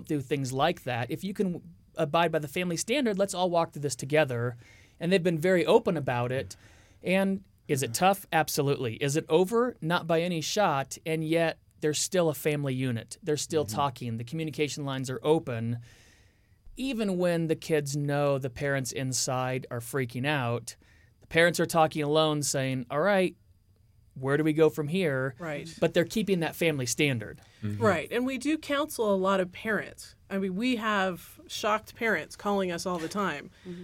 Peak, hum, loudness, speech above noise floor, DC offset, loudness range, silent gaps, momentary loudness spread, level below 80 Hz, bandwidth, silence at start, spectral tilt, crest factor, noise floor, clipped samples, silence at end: -8 dBFS; none; -28 LUFS; 34 dB; under 0.1%; 3 LU; none; 9 LU; -62 dBFS; 17 kHz; 0 s; -5 dB/octave; 22 dB; -62 dBFS; under 0.1%; 0 s